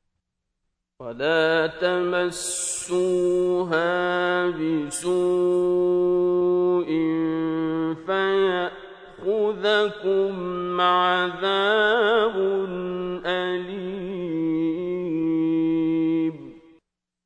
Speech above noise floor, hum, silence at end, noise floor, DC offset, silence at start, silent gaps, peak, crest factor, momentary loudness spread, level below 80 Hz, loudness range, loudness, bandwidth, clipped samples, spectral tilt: 57 dB; none; 0.65 s; -78 dBFS; under 0.1%; 1 s; none; -8 dBFS; 16 dB; 9 LU; -60 dBFS; 3 LU; -23 LUFS; 11 kHz; under 0.1%; -4.5 dB/octave